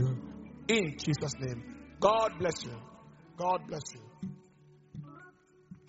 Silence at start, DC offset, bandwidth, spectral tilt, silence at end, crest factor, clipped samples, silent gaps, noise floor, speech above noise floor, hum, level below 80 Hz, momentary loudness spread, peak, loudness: 0 s; under 0.1%; 8 kHz; -4.5 dB/octave; 0.1 s; 24 dB; under 0.1%; none; -60 dBFS; 28 dB; none; -62 dBFS; 22 LU; -10 dBFS; -33 LUFS